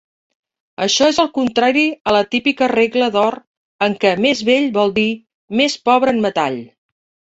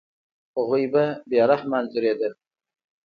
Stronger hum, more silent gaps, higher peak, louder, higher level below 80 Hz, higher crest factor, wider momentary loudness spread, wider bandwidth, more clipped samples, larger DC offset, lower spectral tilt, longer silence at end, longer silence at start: neither; first, 2.00-2.05 s, 3.47-3.79 s, 5.34-5.48 s vs none; first, -2 dBFS vs -6 dBFS; first, -16 LUFS vs -23 LUFS; first, -56 dBFS vs -72 dBFS; about the same, 16 dB vs 18 dB; about the same, 7 LU vs 9 LU; first, 8.2 kHz vs 5.2 kHz; neither; neither; second, -3.5 dB/octave vs -8.5 dB/octave; about the same, 0.65 s vs 0.75 s; first, 0.8 s vs 0.55 s